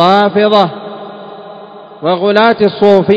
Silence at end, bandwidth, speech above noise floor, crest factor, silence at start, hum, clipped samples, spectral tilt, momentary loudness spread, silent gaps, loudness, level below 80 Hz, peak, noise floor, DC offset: 0 s; 8 kHz; 23 dB; 10 dB; 0 s; none; 0.8%; -7 dB/octave; 21 LU; none; -10 LUFS; -56 dBFS; 0 dBFS; -32 dBFS; under 0.1%